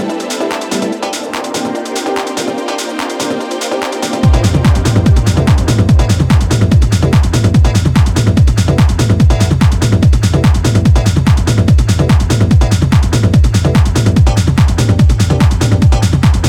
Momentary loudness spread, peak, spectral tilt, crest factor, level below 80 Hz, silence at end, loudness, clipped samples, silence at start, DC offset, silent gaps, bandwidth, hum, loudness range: 7 LU; 0 dBFS; -6 dB/octave; 10 dB; -16 dBFS; 0 s; -11 LUFS; under 0.1%; 0 s; under 0.1%; none; 15 kHz; none; 6 LU